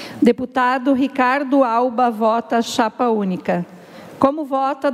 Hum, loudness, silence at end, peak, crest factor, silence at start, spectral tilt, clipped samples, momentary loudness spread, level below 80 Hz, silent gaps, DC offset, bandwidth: none; -18 LUFS; 0 s; -2 dBFS; 16 dB; 0 s; -5.5 dB/octave; under 0.1%; 5 LU; -62 dBFS; none; under 0.1%; 14.5 kHz